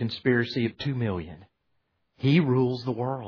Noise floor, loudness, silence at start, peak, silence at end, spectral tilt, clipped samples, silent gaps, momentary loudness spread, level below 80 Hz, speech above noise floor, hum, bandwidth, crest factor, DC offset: -75 dBFS; -26 LUFS; 0 s; -10 dBFS; 0 s; -8.5 dB/octave; under 0.1%; none; 9 LU; -60 dBFS; 49 dB; none; 5.4 kHz; 18 dB; under 0.1%